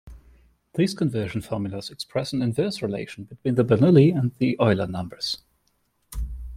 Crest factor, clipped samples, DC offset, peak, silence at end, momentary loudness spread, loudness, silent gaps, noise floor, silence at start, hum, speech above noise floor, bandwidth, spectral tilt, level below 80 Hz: 20 dB; under 0.1%; under 0.1%; -4 dBFS; 0 s; 17 LU; -23 LUFS; none; -69 dBFS; 0.05 s; none; 47 dB; 15.5 kHz; -7 dB/octave; -42 dBFS